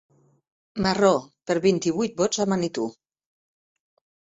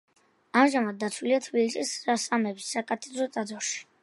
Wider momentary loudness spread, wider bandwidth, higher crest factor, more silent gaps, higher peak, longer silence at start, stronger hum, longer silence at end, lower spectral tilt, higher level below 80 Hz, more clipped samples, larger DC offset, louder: about the same, 9 LU vs 9 LU; second, 8 kHz vs 11.5 kHz; about the same, 22 dB vs 22 dB; neither; about the same, -4 dBFS vs -6 dBFS; first, 0.75 s vs 0.55 s; neither; first, 1.4 s vs 0.2 s; first, -5 dB/octave vs -3 dB/octave; first, -58 dBFS vs -82 dBFS; neither; neither; first, -24 LUFS vs -28 LUFS